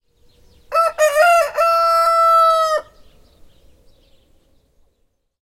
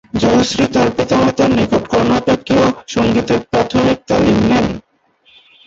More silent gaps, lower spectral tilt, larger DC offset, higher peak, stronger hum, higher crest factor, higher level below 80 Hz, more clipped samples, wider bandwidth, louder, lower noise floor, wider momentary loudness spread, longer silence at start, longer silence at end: neither; second, 0.5 dB/octave vs -5.5 dB/octave; neither; about the same, -4 dBFS vs -2 dBFS; neither; about the same, 14 dB vs 12 dB; second, -54 dBFS vs -38 dBFS; neither; first, 16.5 kHz vs 8 kHz; about the same, -14 LUFS vs -14 LUFS; first, -65 dBFS vs -53 dBFS; first, 7 LU vs 3 LU; first, 0.7 s vs 0.15 s; first, 2.6 s vs 0.85 s